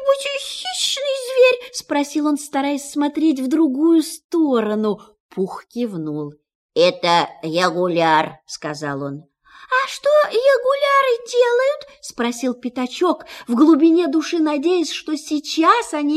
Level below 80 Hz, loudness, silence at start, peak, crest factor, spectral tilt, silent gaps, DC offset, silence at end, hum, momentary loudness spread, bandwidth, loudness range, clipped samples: -66 dBFS; -18 LUFS; 0 s; 0 dBFS; 18 dB; -4 dB/octave; 4.24-4.29 s, 5.20-5.29 s, 6.55-6.69 s; under 0.1%; 0 s; none; 11 LU; 14 kHz; 3 LU; under 0.1%